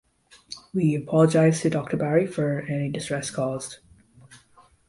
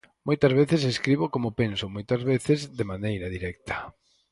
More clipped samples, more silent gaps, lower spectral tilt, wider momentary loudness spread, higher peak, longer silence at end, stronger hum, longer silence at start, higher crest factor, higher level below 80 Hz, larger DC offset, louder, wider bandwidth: neither; neither; about the same, -6.5 dB/octave vs -6.5 dB/octave; about the same, 14 LU vs 12 LU; about the same, -6 dBFS vs -8 dBFS; about the same, 0.5 s vs 0.4 s; neither; first, 0.5 s vs 0.25 s; about the same, 20 dB vs 18 dB; second, -60 dBFS vs -50 dBFS; neither; about the same, -24 LUFS vs -26 LUFS; about the same, 11.5 kHz vs 11.5 kHz